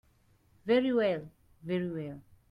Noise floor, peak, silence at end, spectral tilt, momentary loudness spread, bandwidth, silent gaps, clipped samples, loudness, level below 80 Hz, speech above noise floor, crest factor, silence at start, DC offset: -67 dBFS; -16 dBFS; 0.3 s; -8 dB/octave; 18 LU; 10.5 kHz; none; under 0.1%; -31 LUFS; -66 dBFS; 36 dB; 16 dB; 0.65 s; under 0.1%